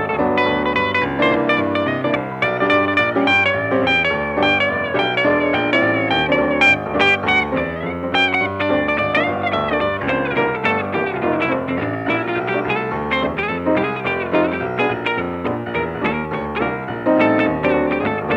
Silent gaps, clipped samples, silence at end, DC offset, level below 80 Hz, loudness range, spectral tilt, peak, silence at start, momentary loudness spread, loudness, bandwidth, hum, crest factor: none; under 0.1%; 0 s; under 0.1%; -46 dBFS; 4 LU; -6.5 dB/octave; -2 dBFS; 0 s; 7 LU; -18 LUFS; 9.2 kHz; none; 16 dB